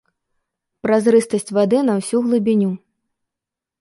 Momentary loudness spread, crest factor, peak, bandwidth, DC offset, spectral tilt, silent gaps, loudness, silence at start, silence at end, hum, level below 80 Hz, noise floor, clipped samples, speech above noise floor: 8 LU; 16 dB; -4 dBFS; 11.5 kHz; under 0.1%; -6.5 dB/octave; none; -17 LUFS; 0.85 s; 1.05 s; none; -64 dBFS; -86 dBFS; under 0.1%; 69 dB